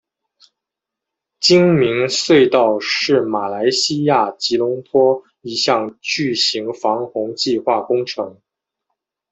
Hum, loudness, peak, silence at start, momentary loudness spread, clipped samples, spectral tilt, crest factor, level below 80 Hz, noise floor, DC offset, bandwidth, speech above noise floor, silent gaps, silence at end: none; -16 LUFS; -2 dBFS; 1.4 s; 9 LU; under 0.1%; -4 dB/octave; 16 dB; -60 dBFS; -83 dBFS; under 0.1%; 8.4 kHz; 67 dB; none; 1 s